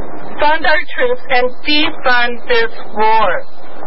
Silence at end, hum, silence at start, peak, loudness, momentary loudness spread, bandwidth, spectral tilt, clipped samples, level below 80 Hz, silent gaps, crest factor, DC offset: 0 s; none; 0 s; 0 dBFS; -14 LUFS; 5 LU; 5.8 kHz; -7 dB/octave; under 0.1%; -40 dBFS; none; 12 dB; 30%